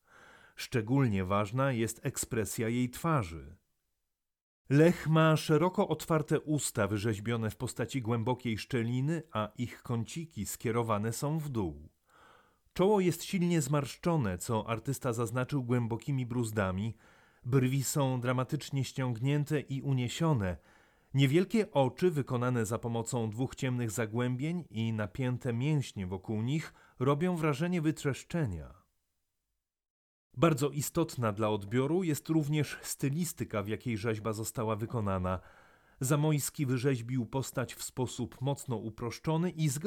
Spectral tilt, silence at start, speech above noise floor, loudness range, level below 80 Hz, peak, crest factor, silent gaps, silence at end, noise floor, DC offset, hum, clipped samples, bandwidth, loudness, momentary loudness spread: -6 dB/octave; 0.6 s; 55 dB; 5 LU; -60 dBFS; -14 dBFS; 18 dB; 4.43-4.65 s, 29.90-30.30 s; 0 s; -86 dBFS; under 0.1%; none; under 0.1%; 18 kHz; -32 LUFS; 8 LU